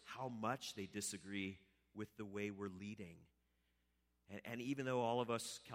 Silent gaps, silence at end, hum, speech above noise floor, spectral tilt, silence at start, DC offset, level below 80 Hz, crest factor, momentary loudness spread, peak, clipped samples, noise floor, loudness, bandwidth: none; 0 s; none; 37 dB; -4.5 dB/octave; 0 s; under 0.1%; -80 dBFS; 20 dB; 15 LU; -26 dBFS; under 0.1%; -83 dBFS; -45 LUFS; 16 kHz